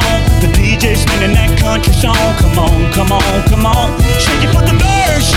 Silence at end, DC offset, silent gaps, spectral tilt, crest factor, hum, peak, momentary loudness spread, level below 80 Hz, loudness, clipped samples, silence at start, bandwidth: 0 s; under 0.1%; none; -5 dB/octave; 10 dB; none; 0 dBFS; 1 LU; -14 dBFS; -11 LUFS; under 0.1%; 0 s; 16.5 kHz